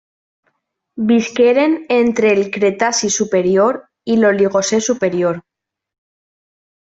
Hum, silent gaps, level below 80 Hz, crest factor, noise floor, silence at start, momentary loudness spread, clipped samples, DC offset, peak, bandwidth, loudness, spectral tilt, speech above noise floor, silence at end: none; none; -60 dBFS; 14 dB; -68 dBFS; 0.95 s; 6 LU; under 0.1%; under 0.1%; -2 dBFS; 8.2 kHz; -15 LUFS; -4 dB/octave; 53 dB; 1.4 s